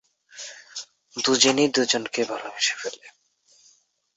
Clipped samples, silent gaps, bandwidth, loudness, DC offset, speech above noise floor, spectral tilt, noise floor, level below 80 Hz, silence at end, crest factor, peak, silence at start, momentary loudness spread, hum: under 0.1%; none; 8.4 kHz; -22 LUFS; under 0.1%; 38 dB; -1.5 dB/octave; -61 dBFS; -72 dBFS; 1.05 s; 24 dB; -2 dBFS; 0.35 s; 20 LU; none